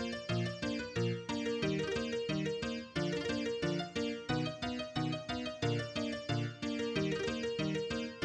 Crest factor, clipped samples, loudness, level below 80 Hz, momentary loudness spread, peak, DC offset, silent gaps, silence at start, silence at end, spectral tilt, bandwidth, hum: 14 dB; under 0.1%; -37 LUFS; -60 dBFS; 3 LU; -22 dBFS; under 0.1%; none; 0 s; 0 s; -5.5 dB/octave; 10.5 kHz; none